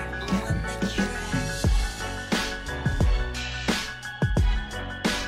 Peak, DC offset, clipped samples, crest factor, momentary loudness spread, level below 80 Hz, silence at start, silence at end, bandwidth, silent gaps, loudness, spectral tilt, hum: -12 dBFS; under 0.1%; under 0.1%; 14 dB; 5 LU; -30 dBFS; 0 s; 0 s; 15 kHz; none; -27 LUFS; -4.5 dB/octave; none